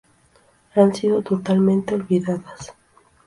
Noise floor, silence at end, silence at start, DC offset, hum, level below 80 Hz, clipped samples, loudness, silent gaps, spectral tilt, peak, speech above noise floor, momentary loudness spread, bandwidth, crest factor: -57 dBFS; 0.55 s; 0.75 s; under 0.1%; none; -58 dBFS; under 0.1%; -20 LUFS; none; -7.5 dB/octave; -2 dBFS; 38 dB; 19 LU; 11.5 kHz; 18 dB